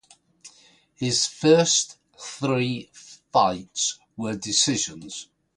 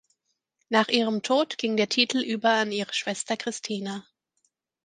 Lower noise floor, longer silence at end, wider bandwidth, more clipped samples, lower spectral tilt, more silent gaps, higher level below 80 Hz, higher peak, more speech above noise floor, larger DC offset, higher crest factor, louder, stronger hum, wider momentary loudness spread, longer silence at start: second, -57 dBFS vs -76 dBFS; second, 0.35 s vs 0.85 s; first, 11.5 kHz vs 9.8 kHz; neither; about the same, -3 dB/octave vs -3 dB/octave; neither; first, -62 dBFS vs -78 dBFS; about the same, -4 dBFS vs -4 dBFS; second, 34 dB vs 51 dB; neither; about the same, 20 dB vs 22 dB; about the same, -23 LUFS vs -25 LUFS; neither; first, 19 LU vs 9 LU; second, 0.45 s vs 0.7 s